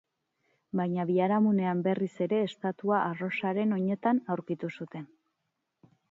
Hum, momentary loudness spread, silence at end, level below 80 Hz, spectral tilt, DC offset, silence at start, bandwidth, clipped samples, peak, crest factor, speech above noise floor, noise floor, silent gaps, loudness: none; 10 LU; 1.05 s; -78 dBFS; -9 dB/octave; under 0.1%; 0.75 s; 7.4 kHz; under 0.1%; -14 dBFS; 16 dB; 53 dB; -82 dBFS; none; -29 LUFS